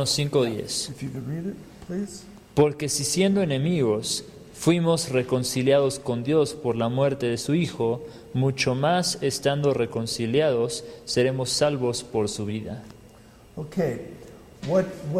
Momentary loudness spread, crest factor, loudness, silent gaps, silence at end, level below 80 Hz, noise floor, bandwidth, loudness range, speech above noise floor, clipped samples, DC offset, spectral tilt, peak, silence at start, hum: 12 LU; 18 dB; -25 LUFS; none; 0 s; -56 dBFS; -50 dBFS; 15.5 kHz; 4 LU; 26 dB; under 0.1%; under 0.1%; -5 dB/octave; -6 dBFS; 0 s; none